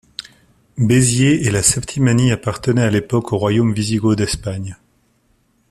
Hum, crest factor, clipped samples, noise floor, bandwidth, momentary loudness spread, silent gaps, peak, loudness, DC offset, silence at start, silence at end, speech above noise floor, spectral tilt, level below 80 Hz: none; 18 dB; under 0.1%; -60 dBFS; 13.5 kHz; 14 LU; none; 0 dBFS; -16 LUFS; under 0.1%; 0.75 s; 0.95 s; 44 dB; -5 dB/octave; -42 dBFS